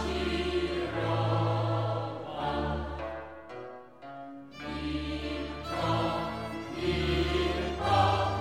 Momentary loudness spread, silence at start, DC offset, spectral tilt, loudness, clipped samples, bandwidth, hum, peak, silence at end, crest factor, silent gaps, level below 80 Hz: 16 LU; 0 s; 0.1%; -6.5 dB/octave; -31 LUFS; under 0.1%; 12.5 kHz; none; -12 dBFS; 0 s; 18 dB; none; -42 dBFS